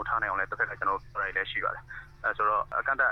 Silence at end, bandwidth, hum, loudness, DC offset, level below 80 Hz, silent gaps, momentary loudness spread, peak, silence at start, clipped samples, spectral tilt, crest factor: 0 s; 6.4 kHz; none; -29 LUFS; under 0.1%; -52 dBFS; none; 7 LU; -14 dBFS; 0 s; under 0.1%; -5 dB/octave; 16 dB